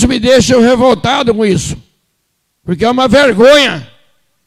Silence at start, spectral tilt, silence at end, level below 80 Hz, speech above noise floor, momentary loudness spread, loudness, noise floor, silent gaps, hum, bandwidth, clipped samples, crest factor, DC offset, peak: 0 s; -4.5 dB/octave; 0.6 s; -34 dBFS; 56 dB; 16 LU; -9 LUFS; -64 dBFS; none; none; 15 kHz; under 0.1%; 10 dB; under 0.1%; 0 dBFS